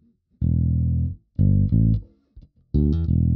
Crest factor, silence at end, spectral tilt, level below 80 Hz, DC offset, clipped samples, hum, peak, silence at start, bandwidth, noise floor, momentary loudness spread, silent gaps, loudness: 14 dB; 0 s; -14 dB/octave; -28 dBFS; under 0.1%; under 0.1%; none; -8 dBFS; 0.4 s; 4.1 kHz; -50 dBFS; 8 LU; none; -22 LUFS